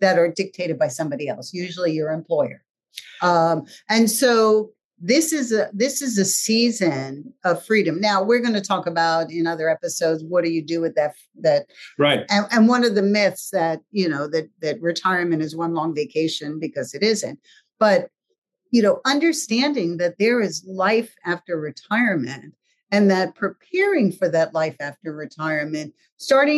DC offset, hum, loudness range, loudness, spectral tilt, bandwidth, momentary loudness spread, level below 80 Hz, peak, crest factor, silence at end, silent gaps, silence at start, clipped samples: under 0.1%; none; 4 LU; -21 LUFS; -4 dB/octave; 12.5 kHz; 11 LU; -78 dBFS; -4 dBFS; 16 dB; 0 s; 2.70-2.74 s, 4.84-4.90 s, 18.38-18.42 s, 26.12-26.17 s; 0 s; under 0.1%